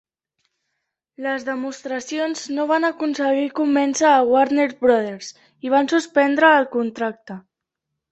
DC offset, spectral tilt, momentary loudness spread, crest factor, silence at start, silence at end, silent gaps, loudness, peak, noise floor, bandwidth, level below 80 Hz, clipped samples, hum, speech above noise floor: under 0.1%; -3.5 dB/octave; 15 LU; 18 dB; 1.2 s; 0.7 s; none; -19 LUFS; -2 dBFS; -81 dBFS; 8.4 kHz; -68 dBFS; under 0.1%; none; 62 dB